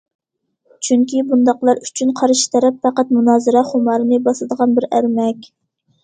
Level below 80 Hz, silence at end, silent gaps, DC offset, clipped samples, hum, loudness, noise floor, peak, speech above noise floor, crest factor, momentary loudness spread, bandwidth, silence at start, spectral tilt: -64 dBFS; 0.6 s; none; under 0.1%; under 0.1%; none; -15 LUFS; -66 dBFS; 0 dBFS; 51 dB; 16 dB; 6 LU; 9.4 kHz; 0.8 s; -4 dB/octave